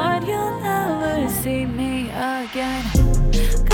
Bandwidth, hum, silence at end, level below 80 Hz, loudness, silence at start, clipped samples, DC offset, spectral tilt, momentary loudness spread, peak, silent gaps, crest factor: 19 kHz; none; 0 s; -22 dBFS; -22 LUFS; 0 s; under 0.1%; under 0.1%; -5.5 dB/octave; 5 LU; -4 dBFS; none; 16 dB